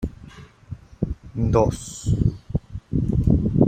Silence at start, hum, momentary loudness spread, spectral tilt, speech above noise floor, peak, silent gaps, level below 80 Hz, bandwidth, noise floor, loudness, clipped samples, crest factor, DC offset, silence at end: 0 s; none; 21 LU; -8 dB/octave; 23 dB; -2 dBFS; none; -32 dBFS; 14.5 kHz; -44 dBFS; -24 LUFS; under 0.1%; 20 dB; under 0.1%; 0 s